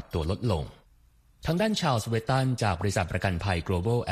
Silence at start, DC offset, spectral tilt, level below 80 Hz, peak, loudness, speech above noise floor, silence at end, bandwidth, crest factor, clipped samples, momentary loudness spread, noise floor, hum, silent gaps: 0 s; under 0.1%; -6 dB/octave; -44 dBFS; -10 dBFS; -28 LUFS; 33 dB; 0 s; 15 kHz; 18 dB; under 0.1%; 6 LU; -60 dBFS; none; none